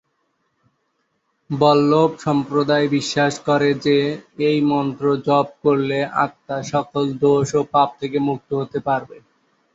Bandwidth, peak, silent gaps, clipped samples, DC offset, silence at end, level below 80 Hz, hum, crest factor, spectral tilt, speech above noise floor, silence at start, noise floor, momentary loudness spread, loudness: 8 kHz; -2 dBFS; none; under 0.1%; under 0.1%; 0.6 s; -58 dBFS; none; 18 dB; -6 dB/octave; 51 dB; 1.5 s; -70 dBFS; 7 LU; -19 LUFS